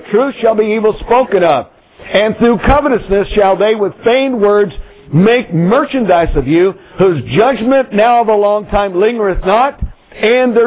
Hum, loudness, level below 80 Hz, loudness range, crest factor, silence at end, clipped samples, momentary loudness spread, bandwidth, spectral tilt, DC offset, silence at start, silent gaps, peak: none; -11 LUFS; -28 dBFS; 1 LU; 12 dB; 0 s; under 0.1%; 5 LU; 4 kHz; -10.5 dB/octave; under 0.1%; 0.05 s; none; 0 dBFS